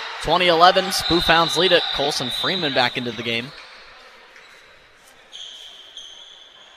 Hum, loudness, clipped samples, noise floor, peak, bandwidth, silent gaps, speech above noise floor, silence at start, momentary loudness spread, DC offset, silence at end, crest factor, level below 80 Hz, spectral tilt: none; -18 LUFS; under 0.1%; -50 dBFS; 0 dBFS; 14.5 kHz; none; 31 dB; 0 s; 23 LU; under 0.1%; 0.4 s; 22 dB; -46 dBFS; -3 dB/octave